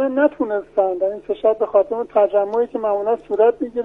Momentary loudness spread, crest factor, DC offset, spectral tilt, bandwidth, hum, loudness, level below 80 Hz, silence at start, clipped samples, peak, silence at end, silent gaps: 5 LU; 16 dB; under 0.1%; -7.5 dB/octave; 3.9 kHz; none; -19 LUFS; -56 dBFS; 0 s; under 0.1%; -2 dBFS; 0 s; none